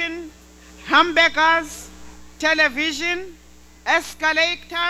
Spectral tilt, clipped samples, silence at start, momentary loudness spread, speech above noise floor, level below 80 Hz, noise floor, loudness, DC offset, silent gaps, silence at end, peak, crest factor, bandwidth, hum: -1.5 dB/octave; under 0.1%; 0 s; 19 LU; 26 dB; -48 dBFS; -45 dBFS; -18 LUFS; under 0.1%; none; 0 s; -2 dBFS; 18 dB; 16 kHz; none